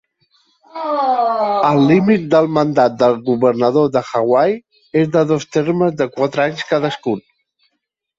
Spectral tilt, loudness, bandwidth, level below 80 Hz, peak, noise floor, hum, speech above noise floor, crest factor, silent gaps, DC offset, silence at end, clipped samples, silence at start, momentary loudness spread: -7 dB/octave; -15 LUFS; 7.8 kHz; -58 dBFS; -2 dBFS; -73 dBFS; none; 59 dB; 14 dB; none; under 0.1%; 1 s; under 0.1%; 0.75 s; 8 LU